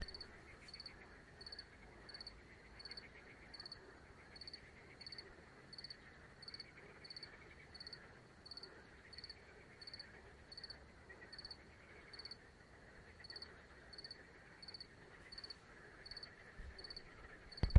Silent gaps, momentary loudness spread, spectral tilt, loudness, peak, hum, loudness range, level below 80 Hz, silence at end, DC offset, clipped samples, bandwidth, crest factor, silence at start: none; 8 LU; -5.5 dB/octave; -55 LUFS; -14 dBFS; none; 1 LU; -62 dBFS; 0 s; under 0.1%; under 0.1%; 11 kHz; 36 dB; 0 s